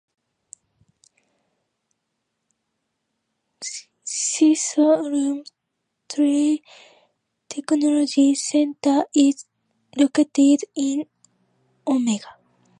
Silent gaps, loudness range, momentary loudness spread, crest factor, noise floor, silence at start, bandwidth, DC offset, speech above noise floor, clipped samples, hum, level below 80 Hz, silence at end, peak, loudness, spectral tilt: none; 6 LU; 15 LU; 18 dB; -78 dBFS; 3.6 s; 10.5 kHz; under 0.1%; 59 dB; under 0.1%; none; -76 dBFS; 0.5 s; -4 dBFS; -20 LUFS; -3 dB/octave